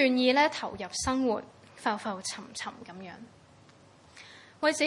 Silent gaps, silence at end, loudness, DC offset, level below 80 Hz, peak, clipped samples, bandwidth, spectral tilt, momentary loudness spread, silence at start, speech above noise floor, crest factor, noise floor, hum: none; 0 s; -30 LUFS; under 0.1%; -60 dBFS; -12 dBFS; under 0.1%; 11.5 kHz; -3 dB/octave; 26 LU; 0 s; 28 dB; 20 dB; -57 dBFS; none